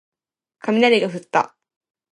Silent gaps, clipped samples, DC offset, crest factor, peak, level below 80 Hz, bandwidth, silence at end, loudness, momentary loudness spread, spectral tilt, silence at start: none; under 0.1%; under 0.1%; 18 dB; -2 dBFS; -74 dBFS; 11.5 kHz; 0.7 s; -19 LUFS; 13 LU; -5 dB/octave; 0.65 s